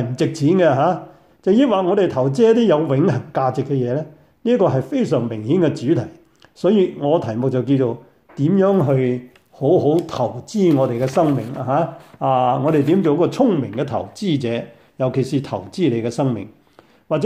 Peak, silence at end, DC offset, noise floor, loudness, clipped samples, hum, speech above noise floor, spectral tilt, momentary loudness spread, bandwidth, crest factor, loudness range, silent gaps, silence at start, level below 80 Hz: -4 dBFS; 0 s; under 0.1%; -52 dBFS; -18 LUFS; under 0.1%; none; 34 dB; -8 dB/octave; 9 LU; 12.5 kHz; 14 dB; 3 LU; none; 0 s; -60 dBFS